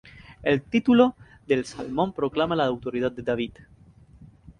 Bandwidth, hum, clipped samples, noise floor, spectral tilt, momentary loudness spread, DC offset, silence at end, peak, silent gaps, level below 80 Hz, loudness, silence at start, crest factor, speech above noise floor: 10 kHz; none; under 0.1%; -51 dBFS; -6.5 dB/octave; 10 LU; under 0.1%; 0.1 s; -6 dBFS; none; -54 dBFS; -25 LUFS; 0.3 s; 20 dB; 27 dB